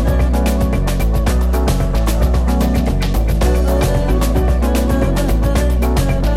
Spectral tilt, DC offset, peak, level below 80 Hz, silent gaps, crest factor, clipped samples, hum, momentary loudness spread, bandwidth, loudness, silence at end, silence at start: -6.5 dB/octave; under 0.1%; -2 dBFS; -16 dBFS; none; 10 dB; under 0.1%; none; 2 LU; 15.5 kHz; -16 LUFS; 0 s; 0 s